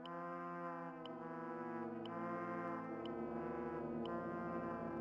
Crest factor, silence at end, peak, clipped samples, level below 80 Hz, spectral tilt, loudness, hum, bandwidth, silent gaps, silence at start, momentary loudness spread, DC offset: 14 dB; 0 s; -30 dBFS; under 0.1%; -72 dBFS; -8 dB/octave; -46 LUFS; none; 7.2 kHz; none; 0 s; 4 LU; under 0.1%